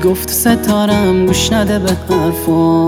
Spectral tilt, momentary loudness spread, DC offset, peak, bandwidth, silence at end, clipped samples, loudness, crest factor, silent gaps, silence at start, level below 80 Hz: -5 dB/octave; 3 LU; under 0.1%; 0 dBFS; 17 kHz; 0 s; under 0.1%; -13 LUFS; 12 dB; none; 0 s; -34 dBFS